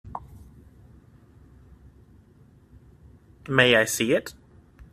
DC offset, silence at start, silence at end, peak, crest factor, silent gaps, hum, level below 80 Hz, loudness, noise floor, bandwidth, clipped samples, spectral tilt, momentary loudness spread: under 0.1%; 0.05 s; 0.6 s; -2 dBFS; 26 dB; none; none; -54 dBFS; -21 LUFS; -55 dBFS; 14 kHz; under 0.1%; -3.5 dB/octave; 24 LU